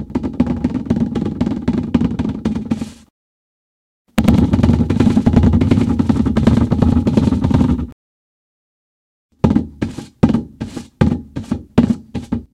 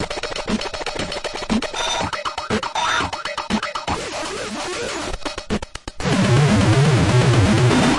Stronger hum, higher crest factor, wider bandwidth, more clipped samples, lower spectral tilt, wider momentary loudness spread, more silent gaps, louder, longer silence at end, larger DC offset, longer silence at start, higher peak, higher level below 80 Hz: neither; about the same, 16 dB vs 14 dB; first, 14.5 kHz vs 11.5 kHz; neither; first, -8.5 dB/octave vs -5 dB/octave; about the same, 11 LU vs 11 LU; first, 3.10-4.05 s, 7.92-9.29 s vs none; first, -16 LUFS vs -20 LUFS; about the same, 0.1 s vs 0 s; neither; about the same, 0 s vs 0 s; first, 0 dBFS vs -4 dBFS; first, -28 dBFS vs -38 dBFS